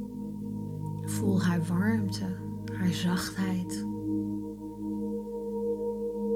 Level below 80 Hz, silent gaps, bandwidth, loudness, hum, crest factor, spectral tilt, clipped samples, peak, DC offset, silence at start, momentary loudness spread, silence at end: -56 dBFS; none; 16 kHz; -32 LUFS; none; 14 dB; -6.5 dB/octave; under 0.1%; -16 dBFS; under 0.1%; 0 s; 10 LU; 0 s